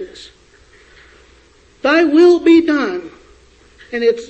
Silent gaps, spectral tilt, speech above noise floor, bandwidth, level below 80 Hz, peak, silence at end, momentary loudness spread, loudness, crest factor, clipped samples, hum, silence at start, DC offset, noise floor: none; -4.5 dB/octave; 36 dB; 8.2 kHz; -52 dBFS; -2 dBFS; 0.05 s; 17 LU; -12 LUFS; 14 dB; under 0.1%; none; 0 s; under 0.1%; -49 dBFS